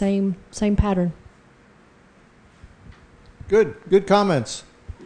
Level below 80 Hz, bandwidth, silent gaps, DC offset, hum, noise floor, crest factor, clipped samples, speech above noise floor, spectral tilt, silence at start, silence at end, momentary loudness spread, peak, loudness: -38 dBFS; 10 kHz; none; under 0.1%; none; -53 dBFS; 18 dB; under 0.1%; 33 dB; -6.5 dB/octave; 0 s; 0 s; 12 LU; -4 dBFS; -21 LUFS